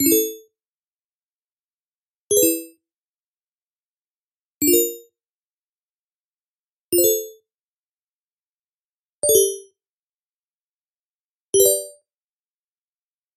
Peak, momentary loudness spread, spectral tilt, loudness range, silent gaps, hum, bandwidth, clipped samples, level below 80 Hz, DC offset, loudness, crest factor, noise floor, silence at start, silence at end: -2 dBFS; 15 LU; -2 dB/octave; 4 LU; 0.68-1.40 s, 1.46-2.30 s, 2.98-4.61 s, 5.30-6.92 s, 7.63-9.22 s, 9.89-11.53 s; none; 15.5 kHz; under 0.1%; -68 dBFS; under 0.1%; -18 LUFS; 24 dB; under -90 dBFS; 0 s; 1.45 s